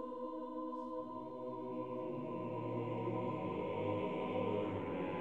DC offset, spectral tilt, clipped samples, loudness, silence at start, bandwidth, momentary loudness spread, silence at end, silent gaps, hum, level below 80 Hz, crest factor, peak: under 0.1%; -9 dB/octave; under 0.1%; -41 LUFS; 0 s; 7.8 kHz; 6 LU; 0 s; none; none; -74 dBFS; 14 dB; -26 dBFS